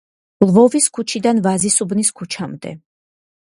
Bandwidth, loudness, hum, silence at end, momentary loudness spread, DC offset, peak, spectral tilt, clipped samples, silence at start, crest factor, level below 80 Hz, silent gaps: 11.5 kHz; -15 LUFS; none; 0.8 s; 15 LU; under 0.1%; 0 dBFS; -4.5 dB/octave; under 0.1%; 0.4 s; 18 dB; -58 dBFS; none